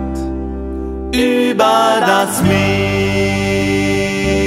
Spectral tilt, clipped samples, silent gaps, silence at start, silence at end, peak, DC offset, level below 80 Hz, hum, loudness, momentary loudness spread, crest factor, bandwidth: -5 dB/octave; under 0.1%; none; 0 s; 0 s; 0 dBFS; under 0.1%; -30 dBFS; none; -14 LUFS; 11 LU; 14 dB; 16 kHz